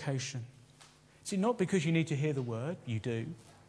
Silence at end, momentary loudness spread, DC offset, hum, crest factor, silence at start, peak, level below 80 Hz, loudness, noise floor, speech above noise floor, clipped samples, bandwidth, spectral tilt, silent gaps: 0.15 s; 15 LU; under 0.1%; none; 18 dB; 0 s; -16 dBFS; -72 dBFS; -34 LUFS; -60 dBFS; 27 dB; under 0.1%; 11 kHz; -6 dB/octave; none